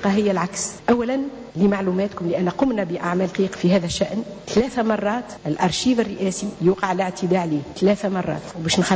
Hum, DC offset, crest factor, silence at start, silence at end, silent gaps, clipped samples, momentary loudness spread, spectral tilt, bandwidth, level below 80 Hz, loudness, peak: none; under 0.1%; 14 dB; 0 s; 0 s; none; under 0.1%; 6 LU; -5.5 dB/octave; 8 kHz; -50 dBFS; -22 LUFS; -6 dBFS